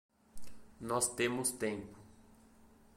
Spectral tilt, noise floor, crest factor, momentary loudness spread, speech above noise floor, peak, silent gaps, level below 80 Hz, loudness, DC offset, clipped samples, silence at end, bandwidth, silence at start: -3 dB/octave; -62 dBFS; 20 dB; 15 LU; 26 dB; -20 dBFS; none; -64 dBFS; -35 LUFS; under 0.1%; under 0.1%; 0.05 s; 16.5 kHz; 0.1 s